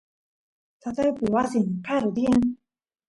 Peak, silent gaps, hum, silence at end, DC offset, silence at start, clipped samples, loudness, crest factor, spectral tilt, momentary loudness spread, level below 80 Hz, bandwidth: -10 dBFS; none; none; 0.55 s; under 0.1%; 0.85 s; under 0.1%; -24 LUFS; 16 dB; -7 dB/octave; 12 LU; -54 dBFS; 11.5 kHz